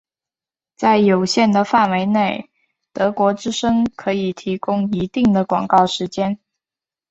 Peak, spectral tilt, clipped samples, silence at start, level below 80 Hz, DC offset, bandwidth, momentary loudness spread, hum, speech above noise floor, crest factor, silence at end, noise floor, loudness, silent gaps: 0 dBFS; -5.5 dB/octave; under 0.1%; 0.8 s; -52 dBFS; under 0.1%; 8.2 kHz; 8 LU; none; over 73 dB; 18 dB; 0.75 s; under -90 dBFS; -18 LUFS; none